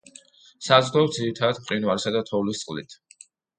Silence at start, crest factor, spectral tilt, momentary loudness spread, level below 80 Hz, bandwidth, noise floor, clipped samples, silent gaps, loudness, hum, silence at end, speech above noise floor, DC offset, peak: 0.6 s; 24 dB; -4.5 dB/octave; 15 LU; -64 dBFS; 9.6 kHz; -53 dBFS; under 0.1%; none; -23 LUFS; none; 0.65 s; 30 dB; under 0.1%; -2 dBFS